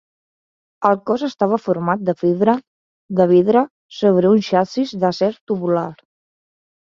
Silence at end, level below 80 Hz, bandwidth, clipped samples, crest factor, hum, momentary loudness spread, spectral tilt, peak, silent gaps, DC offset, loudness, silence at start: 0.9 s; -62 dBFS; 7.4 kHz; under 0.1%; 16 dB; none; 8 LU; -7.5 dB/octave; -2 dBFS; 2.67-3.09 s, 3.70-3.89 s, 5.41-5.47 s; under 0.1%; -18 LUFS; 0.8 s